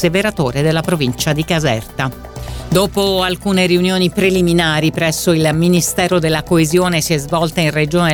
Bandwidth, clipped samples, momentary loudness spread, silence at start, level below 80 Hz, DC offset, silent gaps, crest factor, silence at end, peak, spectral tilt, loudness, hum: 19 kHz; under 0.1%; 5 LU; 0 s; -36 dBFS; 0.1%; none; 14 dB; 0 s; 0 dBFS; -5 dB/octave; -15 LUFS; none